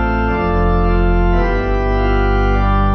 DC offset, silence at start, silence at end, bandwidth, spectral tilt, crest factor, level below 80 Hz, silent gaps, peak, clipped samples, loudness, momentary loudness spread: under 0.1%; 0 s; 0 s; 6 kHz; -9 dB/octave; 10 dB; -16 dBFS; none; -4 dBFS; under 0.1%; -16 LUFS; 2 LU